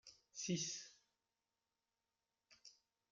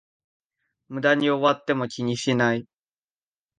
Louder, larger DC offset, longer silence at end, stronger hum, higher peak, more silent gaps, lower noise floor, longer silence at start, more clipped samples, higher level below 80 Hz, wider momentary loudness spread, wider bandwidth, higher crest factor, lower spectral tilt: second, -45 LUFS vs -23 LUFS; neither; second, 0.4 s vs 0.95 s; neither; second, -30 dBFS vs -6 dBFS; neither; about the same, under -90 dBFS vs under -90 dBFS; second, 0.05 s vs 0.9 s; neither; second, -88 dBFS vs -68 dBFS; first, 22 LU vs 7 LU; about the same, 9.2 kHz vs 9.6 kHz; about the same, 22 dB vs 20 dB; second, -3 dB/octave vs -5 dB/octave